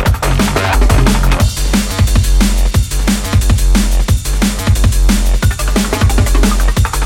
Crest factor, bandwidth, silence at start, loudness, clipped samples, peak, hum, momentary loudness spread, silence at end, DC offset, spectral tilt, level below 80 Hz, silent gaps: 10 dB; 16.5 kHz; 0 s; -13 LUFS; under 0.1%; 0 dBFS; none; 3 LU; 0 s; under 0.1%; -5 dB/octave; -12 dBFS; none